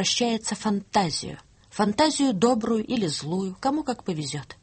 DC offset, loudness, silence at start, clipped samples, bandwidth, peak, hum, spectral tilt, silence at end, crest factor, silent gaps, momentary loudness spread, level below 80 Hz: under 0.1%; -25 LUFS; 0 s; under 0.1%; 8.8 kHz; -8 dBFS; none; -4 dB/octave; 0.1 s; 18 dB; none; 9 LU; -58 dBFS